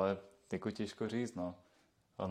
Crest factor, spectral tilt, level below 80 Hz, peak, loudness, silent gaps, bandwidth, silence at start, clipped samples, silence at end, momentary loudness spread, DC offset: 22 dB; -6.5 dB/octave; -76 dBFS; -20 dBFS; -41 LUFS; none; 12.5 kHz; 0 s; under 0.1%; 0 s; 10 LU; under 0.1%